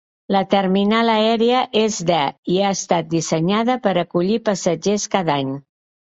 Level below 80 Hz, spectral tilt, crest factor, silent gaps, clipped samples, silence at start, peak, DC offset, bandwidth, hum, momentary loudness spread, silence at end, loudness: -60 dBFS; -4.5 dB/octave; 16 dB; 2.38-2.43 s; under 0.1%; 0.3 s; -2 dBFS; under 0.1%; 8.2 kHz; none; 5 LU; 0.55 s; -18 LUFS